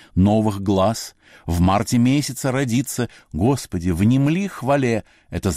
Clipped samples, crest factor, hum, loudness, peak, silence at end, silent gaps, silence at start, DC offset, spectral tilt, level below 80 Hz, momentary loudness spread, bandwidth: under 0.1%; 12 dB; none; -20 LUFS; -8 dBFS; 0 s; none; 0.15 s; under 0.1%; -6 dB/octave; -40 dBFS; 9 LU; 15.5 kHz